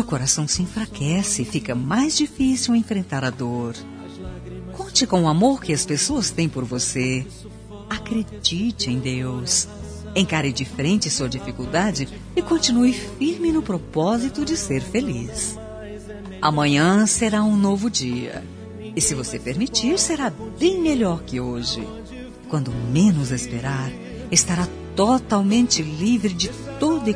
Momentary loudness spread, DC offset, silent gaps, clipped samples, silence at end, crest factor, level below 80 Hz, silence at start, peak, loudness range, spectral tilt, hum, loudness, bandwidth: 16 LU; under 0.1%; none; under 0.1%; 0 s; 20 dB; -42 dBFS; 0 s; -2 dBFS; 3 LU; -4 dB/octave; none; -21 LUFS; 11 kHz